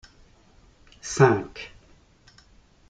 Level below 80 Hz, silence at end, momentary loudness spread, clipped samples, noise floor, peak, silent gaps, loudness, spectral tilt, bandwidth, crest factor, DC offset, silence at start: -56 dBFS; 1.25 s; 21 LU; under 0.1%; -56 dBFS; -4 dBFS; none; -22 LUFS; -5.5 dB/octave; 9.4 kHz; 24 dB; under 0.1%; 1.05 s